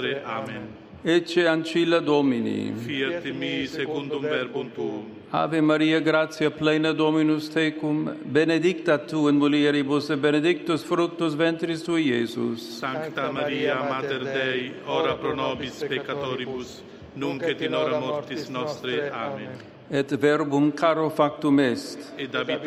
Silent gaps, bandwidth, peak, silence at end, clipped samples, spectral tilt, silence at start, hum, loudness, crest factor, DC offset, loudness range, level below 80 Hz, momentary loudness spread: none; 12.5 kHz; -6 dBFS; 0 s; under 0.1%; -6 dB/octave; 0 s; none; -24 LUFS; 18 dB; under 0.1%; 6 LU; -64 dBFS; 11 LU